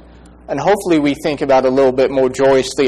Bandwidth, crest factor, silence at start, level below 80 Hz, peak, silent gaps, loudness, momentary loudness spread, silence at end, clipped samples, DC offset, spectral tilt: 13 kHz; 10 dB; 0.5 s; -44 dBFS; -4 dBFS; none; -14 LUFS; 6 LU; 0 s; under 0.1%; under 0.1%; -5 dB/octave